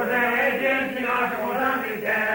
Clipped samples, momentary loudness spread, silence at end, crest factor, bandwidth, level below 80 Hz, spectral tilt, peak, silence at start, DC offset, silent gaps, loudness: under 0.1%; 4 LU; 0 s; 12 dB; 16.5 kHz; -60 dBFS; -4.5 dB/octave; -10 dBFS; 0 s; under 0.1%; none; -23 LUFS